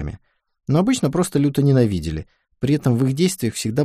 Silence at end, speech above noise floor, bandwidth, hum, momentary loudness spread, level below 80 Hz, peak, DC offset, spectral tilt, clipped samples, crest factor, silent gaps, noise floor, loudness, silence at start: 0 s; 25 dB; 15.5 kHz; none; 12 LU; -42 dBFS; -4 dBFS; under 0.1%; -6.5 dB/octave; under 0.1%; 16 dB; none; -43 dBFS; -19 LUFS; 0 s